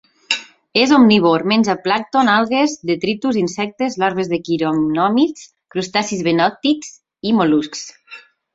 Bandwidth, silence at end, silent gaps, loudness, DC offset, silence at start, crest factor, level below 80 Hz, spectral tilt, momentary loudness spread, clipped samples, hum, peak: 7.8 kHz; 0.35 s; none; -17 LUFS; under 0.1%; 0.3 s; 16 dB; -58 dBFS; -4.5 dB/octave; 10 LU; under 0.1%; none; 0 dBFS